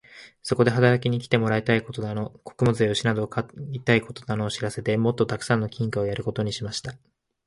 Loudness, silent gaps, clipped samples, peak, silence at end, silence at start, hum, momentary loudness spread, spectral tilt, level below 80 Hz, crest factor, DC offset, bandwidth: -25 LUFS; none; under 0.1%; -4 dBFS; 0.5 s; 0.15 s; none; 11 LU; -6 dB/octave; -54 dBFS; 20 dB; under 0.1%; 11.5 kHz